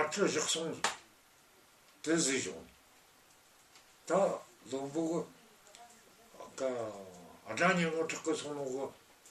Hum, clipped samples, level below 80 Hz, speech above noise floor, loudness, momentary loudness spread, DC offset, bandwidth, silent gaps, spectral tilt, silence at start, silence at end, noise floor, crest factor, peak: none; under 0.1%; -76 dBFS; 30 dB; -35 LUFS; 21 LU; under 0.1%; 14.5 kHz; none; -3.5 dB/octave; 0 s; 0 s; -64 dBFS; 22 dB; -14 dBFS